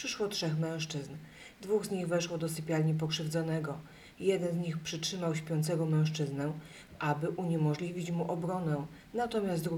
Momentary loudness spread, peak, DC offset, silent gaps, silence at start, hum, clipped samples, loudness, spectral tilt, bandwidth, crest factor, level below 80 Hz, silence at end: 10 LU; -16 dBFS; under 0.1%; none; 0 s; none; under 0.1%; -34 LUFS; -5.5 dB/octave; 15.5 kHz; 18 dB; -66 dBFS; 0 s